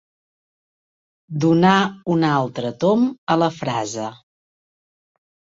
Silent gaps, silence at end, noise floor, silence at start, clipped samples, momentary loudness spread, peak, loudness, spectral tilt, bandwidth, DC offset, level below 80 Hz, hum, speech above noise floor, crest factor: 3.18-3.27 s; 1.45 s; under -90 dBFS; 1.3 s; under 0.1%; 12 LU; -2 dBFS; -19 LUFS; -6 dB/octave; 8 kHz; under 0.1%; -60 dBFS; none; over 71 dB; 20 dB